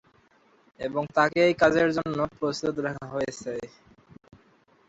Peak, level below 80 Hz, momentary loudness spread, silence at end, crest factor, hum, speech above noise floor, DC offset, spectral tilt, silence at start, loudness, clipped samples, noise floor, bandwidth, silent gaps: -6 dBFS; -58 dBFS; 15 LU; 1.2 s; 20 dB; none; 36 dB; under 0.1%; -5.5 dB/octave; 0.8 s; -26 LUFS; under 0.1%; -62 dBFS; 8 kHz; none